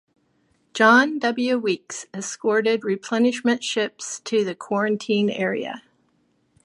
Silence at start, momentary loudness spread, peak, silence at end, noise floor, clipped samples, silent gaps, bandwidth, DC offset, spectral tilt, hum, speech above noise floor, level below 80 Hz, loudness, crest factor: 0.75 s; 15 LU; -2 dBFS; 0.85 s; -66 dBFS; under 0.1%; none; 11.5 kHz; under 0.1%; -4 dB/octave; none; 44 dB; -74 dBFS; -22 LUFS; 20 dB